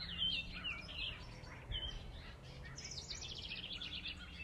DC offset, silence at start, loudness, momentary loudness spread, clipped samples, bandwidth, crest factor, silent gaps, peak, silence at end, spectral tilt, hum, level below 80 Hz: under 0.1%; 0 s; -44 LUFS; 15 LU; under 0.1%; 14 kHz; 18 dB; none; -28 dBFS; 0 s; -2.5 dB/octave; none; -54 dBFS